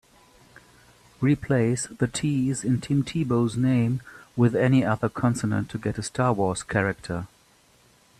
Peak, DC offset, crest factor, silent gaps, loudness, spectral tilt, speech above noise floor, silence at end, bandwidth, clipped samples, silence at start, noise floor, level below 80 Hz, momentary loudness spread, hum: -6 dBFS; under 0.1%; 18 dB; none; -25 LUFS; -6.5 dB/octave; 35 dB; 0.95 s; 12.5 kHz; under 0.1%; 1.2 s; -59 dBFS; -54 dBFS; 8 LU; none